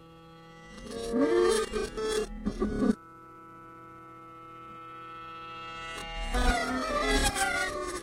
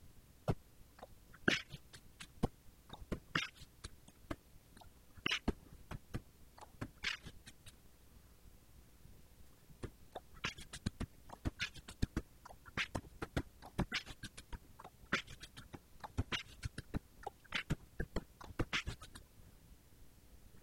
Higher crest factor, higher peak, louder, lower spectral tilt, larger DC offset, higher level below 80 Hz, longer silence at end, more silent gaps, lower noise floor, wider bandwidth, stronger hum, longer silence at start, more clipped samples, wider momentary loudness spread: second, 20 dB vs 30 dB; first, -12 dBFS vs -16 dBFS; first, -30 LUFS vs -44 LUFS; about the same, -4 dB/octave vs -4.5 dB/octave; neither; first, -40 dBFS vs -54 dBFS; about the same, 0 s vs 0 s; neither; second, -51 dBFS vs -62 dBFS; about the same, 16 kHz vs 16.5 kHz; neither; about the same, 0 s vs 0 s; neither; about the same, 22 LU vs 24 LU